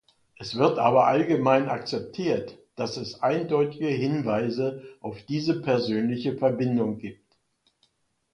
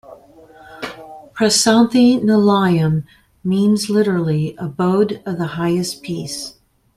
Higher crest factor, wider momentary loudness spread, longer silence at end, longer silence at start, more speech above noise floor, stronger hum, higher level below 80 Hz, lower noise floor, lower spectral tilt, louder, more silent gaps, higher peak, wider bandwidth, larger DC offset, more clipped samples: about the same, 20 dB vs 16 dB; second, 14 LU vs 18 LU; first, 1.2 s vs 0.45 s; first, 0.4 s vs 0.1 s; first, 45 dB vs 28 dB; neither; second, -64 dBFS vs -52 dBFS; first, -70 dBFS vs -44 dBFS; first, -7 dB/octave vs -5 dB/octave; second, -25 LUFS vs -16 LUFS; neither; second, -6 dBFS vs -2 dBFS; second, 10.5 kHz vs 14.5 kHz; neither; neither